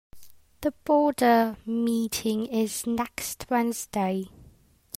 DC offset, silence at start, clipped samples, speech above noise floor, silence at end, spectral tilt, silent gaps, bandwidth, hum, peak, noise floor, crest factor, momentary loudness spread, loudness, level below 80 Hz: under 0.1%; 0.15 s; under 0.1%; 31 dB; 0.55 s; -4.5 dB/octave; none; 16 kHz; none; -10 dBFS; -57 dBFS; 16 dB; 11 LU; -26 LUFS; -58 dBFS